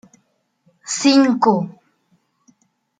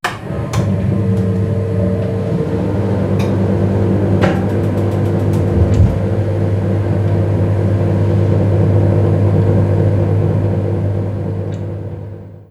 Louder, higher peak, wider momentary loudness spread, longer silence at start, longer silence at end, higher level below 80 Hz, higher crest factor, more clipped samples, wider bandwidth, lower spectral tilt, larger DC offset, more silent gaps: about the same, -16 LUFS vs -15 LUFS; about the same, -2 dBFS vs -2 dBFS; first, 17 LU vs 8 LU; first, 0.85 s vs 0.05 s; first, 1.3 s vs 0.05 s; second, -68 dBFS vs -30 dBFS; first, 20 dB vs 12 dB; neither; first, 9.4 kHz vs 8.4 kHz; second, -4 dB/octave vs -9 dB/octave; neither; neither